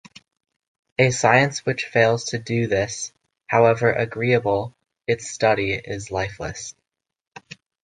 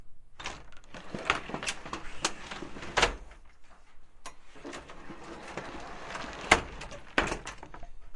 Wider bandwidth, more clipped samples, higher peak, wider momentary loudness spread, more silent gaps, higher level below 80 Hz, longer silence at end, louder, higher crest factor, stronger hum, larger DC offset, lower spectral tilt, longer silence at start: second, 10 kHz vs 11.5 kHz; neither; about the same, -2 dBFS vs -4 dBFS; second, 16 LU vs 22 LU; neither; about the same, -52 dBFS vs -48 dBFS; first, 1.1 s vs 0 s; first, -21 LUFS vs -33 LUFS; second, 20 dB vs 32 dB; neither; neither; first, -4.5 dB/octave vs -2.5 dB/octave; first, 1 s vs 0 s